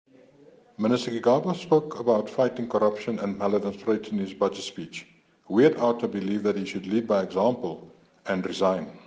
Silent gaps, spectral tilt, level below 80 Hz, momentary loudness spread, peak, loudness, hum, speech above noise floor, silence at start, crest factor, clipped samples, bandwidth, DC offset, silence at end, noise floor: none; -6.5 dB/octave; -68 dBFS; 10 LU; -6 dBFS; -26 LUFS; none; 29 dB; 0.8 s; 20 dB; under 0.1%; 9.4 kHz; under 0.1%; 0.1 s; -55 dBFS